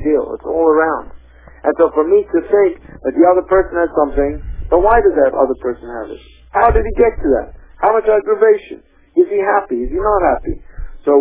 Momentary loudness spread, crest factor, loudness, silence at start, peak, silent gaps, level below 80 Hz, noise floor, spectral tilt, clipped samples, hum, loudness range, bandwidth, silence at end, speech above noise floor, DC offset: 12 LU; 14 dB; -15 LUFS; 0 s; 0 dBFS; none; -30 dBFS; -38 dBFS; -11 dB/octave; under 0.1%; none; 2 LU; 3.7 kHz; 0 s; 25 dB; under 0.1%